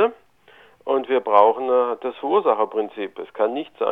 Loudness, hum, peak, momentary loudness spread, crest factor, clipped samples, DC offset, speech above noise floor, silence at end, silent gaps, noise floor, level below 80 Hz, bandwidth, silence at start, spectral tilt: -21 LUFS; none; 0 dBFS; 13 LU; 20 dB; under 0.1%; under 0.1%; 32 dB; 0 s; none; -52 dBFS; -72 dBFS; 4 kHz; 0 s; -6.5 dB/octave